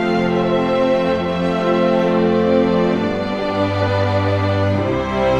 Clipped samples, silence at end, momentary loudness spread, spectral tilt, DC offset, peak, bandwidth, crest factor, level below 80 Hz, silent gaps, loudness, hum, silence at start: under 0.1%; 0 s; 4 LU; -7.5 dB/octave; under 0.1%; -4 dBFS; 8.8 kHz; 12 dB; -42 dBFS; none; -17 LUFS; none; 0 s